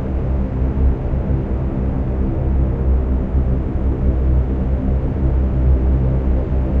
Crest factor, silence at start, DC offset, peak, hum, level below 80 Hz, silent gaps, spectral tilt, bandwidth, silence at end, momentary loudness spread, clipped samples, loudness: 12 dB; 0 s; under 0.1%; -4 dBFS; none; -18 dBFS; none; -11.5 dB/octave; 3 kHz; 0 s; 4 LU; under 0.1%; -19 LUFS